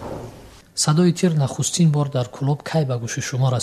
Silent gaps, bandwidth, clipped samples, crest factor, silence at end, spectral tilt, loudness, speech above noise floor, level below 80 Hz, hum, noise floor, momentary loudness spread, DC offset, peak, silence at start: none; 13.5 kHz; under 0.1%; 16 dB; 0 s; -5.5 dB/octave; -20 LUFS; 23 dB; -52 dBFS; none; -42 dBFS; 13 LU; under 0.1%; -6 dBFS; 0 s